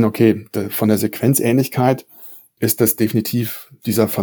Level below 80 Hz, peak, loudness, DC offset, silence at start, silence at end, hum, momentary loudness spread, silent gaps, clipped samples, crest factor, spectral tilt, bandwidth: -64 dBFS; -2 dBFS; -18 LUFS; under 0.1%; 0 s; 0 s; none; 11 LU; none; under 0.1%; 16 dB; -5.5 dB/octave; over 20 kHz